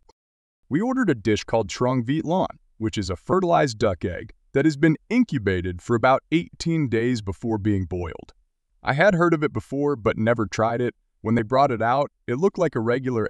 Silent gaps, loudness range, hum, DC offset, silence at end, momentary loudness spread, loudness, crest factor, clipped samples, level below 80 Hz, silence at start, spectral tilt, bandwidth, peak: none; 2 LU; none; under 0.1%; 0 s; 9 LU; -23 LUFS; 18 dB; under 0.1%; -50 dBFS; 0.7 s; -6.5 dB/octave; 11 kHz; -4 dBFS